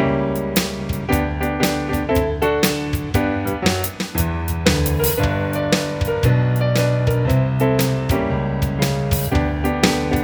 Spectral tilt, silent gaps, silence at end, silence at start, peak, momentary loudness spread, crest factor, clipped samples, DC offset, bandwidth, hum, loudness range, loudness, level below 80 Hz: -5.5 dB/octave; none; 0 s; 0 s; -2 dBFS; 4 LU; 18 dB; under 0.1%; under 0.1%; over 20 kHz; none; 2 LU; -19 LUFS; -30 dBFS